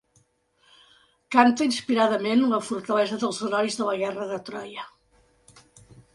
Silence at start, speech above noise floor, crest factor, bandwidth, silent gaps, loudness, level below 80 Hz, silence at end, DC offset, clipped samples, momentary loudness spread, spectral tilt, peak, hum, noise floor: 1.3 s; 42 dB; 24 dB; 11.5 kHz; none; -24 LUFS; -68 dBFS; 1.25 s; under 0.1%; under 0.1%; 16 LU; -4 dB/octave; -2 dBFS; none; -65 dBFS